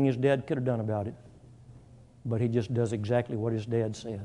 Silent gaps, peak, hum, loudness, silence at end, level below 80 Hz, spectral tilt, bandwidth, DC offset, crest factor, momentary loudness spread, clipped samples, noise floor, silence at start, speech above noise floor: none; -12 dBFS; none; -30 LUFS; 0 s; -62 dBFS; -8 dB/octave; 10.5 kHz; under 0.1%; 18 dB; 7 LU; under 0.1%; -53 dBFS; 0 s; 25 dB